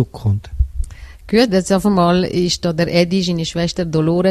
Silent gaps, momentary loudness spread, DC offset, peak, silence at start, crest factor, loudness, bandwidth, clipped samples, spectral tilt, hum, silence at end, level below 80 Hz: none; 9 LU; under 0.1%; 0 dBFS; 0 s; 16 dB; -17 LUFS; 13.5 kHz; under 0.1%; -6 dB/octave; none; 0 s; -28 dBFS